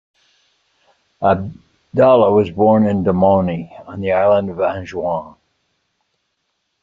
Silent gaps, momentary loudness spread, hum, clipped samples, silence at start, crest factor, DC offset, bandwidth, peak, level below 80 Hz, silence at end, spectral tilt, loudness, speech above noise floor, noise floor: none; 13 LU; none; under 0.1%; 1.2 s; 16 dB; under 0.1%; 7.2 kHz; -2 dBFS; -54 dBFS; 1.5 s; -9 dB/octave; -16 LUFS; 56 dB; -71 dBFS